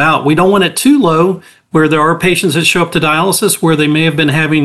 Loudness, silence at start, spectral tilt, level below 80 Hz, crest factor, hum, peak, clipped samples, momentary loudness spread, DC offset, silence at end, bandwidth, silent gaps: -10 LUFS; 0 s; -4.5 dB/octave; -46 dBFS; 10 dB; none; 0 dBFS; under 0.1%; 3 LU; 0.6%; 0 s; 13 kHz; none